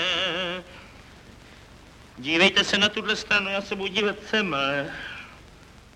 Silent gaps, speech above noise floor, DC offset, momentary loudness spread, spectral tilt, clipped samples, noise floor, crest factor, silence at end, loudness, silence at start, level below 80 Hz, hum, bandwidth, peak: none; 25 dB; under 0.1%; 17 LU; -3 dB/octave; under 0.1%; -49 dBFS; 22 dB; 0.15 s; -23 LUFS; 0 s; -54 dBFS; none; 15 kHz; -6 dBFS